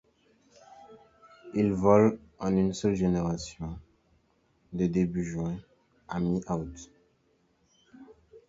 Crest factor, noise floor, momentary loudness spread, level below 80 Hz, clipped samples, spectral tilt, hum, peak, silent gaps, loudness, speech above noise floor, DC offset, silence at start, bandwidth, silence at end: 24 dB; -69 dBFS; 18 LU; -52 dBFS; under 0.1%; -7.5 dB/octave; none; -6 dBFS; none; -28 LUFS; 42 dB; under 0.1%; 0.8 s; 7.8 kHz; 0.1 s